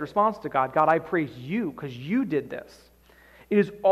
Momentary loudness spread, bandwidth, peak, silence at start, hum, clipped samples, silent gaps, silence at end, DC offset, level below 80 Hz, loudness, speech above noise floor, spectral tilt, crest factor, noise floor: 11 LU; 13 kHz; -8 dBFS; 0 s; none; under 0.1%; none; 0 s; under 0.1%; -62 dBFS; -26 LUFS; 30 dB; -8 dB/octave; 18 dB; -55 dBFS